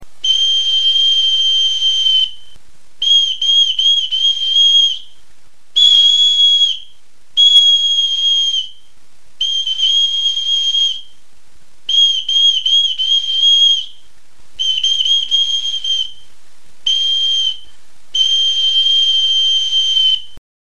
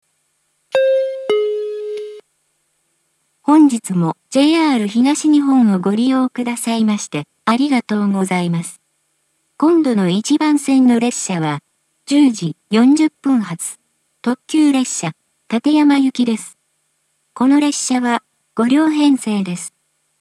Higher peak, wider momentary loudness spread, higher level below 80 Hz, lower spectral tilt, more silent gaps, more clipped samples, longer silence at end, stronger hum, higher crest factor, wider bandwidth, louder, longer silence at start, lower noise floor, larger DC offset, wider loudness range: about the same, 0 dBFS vs 0 dBFS; about the same, 10 LU vs 12 LU; first, -58 dBFS vs -74 dBFS; second, 3.5 dB/octave vs -5 dB/octave; neither; neither; about the same, 0.5 s vs 0.5 s; neither; about the same, 14 dB vs 16 dB; second, 10.5 kHz vs 12.5 kHz; first, -11 LUFS vs -16 LUFS; second, 0 s vs 0.75 s; second, -53 dBFS vs -66 dBFS; first, 4% vs under 0.1%; about the same, 5 LU vs 4 LU